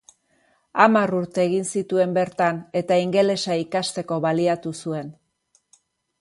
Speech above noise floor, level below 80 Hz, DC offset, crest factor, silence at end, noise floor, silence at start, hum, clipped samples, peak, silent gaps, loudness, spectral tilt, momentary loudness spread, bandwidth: 45 dB; -68 dBFS; under 0.1%; 22 dB; 1.1 s; -66 dBFS; 0.75 s; none; under 0.1%; 0 dBFS; none; -22 LUFS; -5 dB/octave; 12 LU; 11.5 kHz